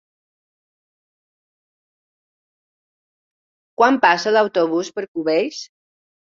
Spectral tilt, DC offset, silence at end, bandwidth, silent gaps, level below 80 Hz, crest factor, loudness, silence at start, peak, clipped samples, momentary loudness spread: -4 dB/octave; under 0.1%; 0.75 s; 7.6 kHz; 5.08-5.14 s; -72 dBFS; 22 dB; -18 LUFS; 3.8 s; -2 dBFS; under 0.1%; 12 LU